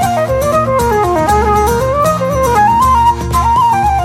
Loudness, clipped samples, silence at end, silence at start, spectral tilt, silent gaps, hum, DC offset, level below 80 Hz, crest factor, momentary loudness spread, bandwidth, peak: -11 LUFS; under 0.1%; 0 s; 0 s; -5.5 dB/octave; none; none; under 0.1%; -24 dBFS; 10 dB; 4 LU; 16.5 kHz; 0 dBFS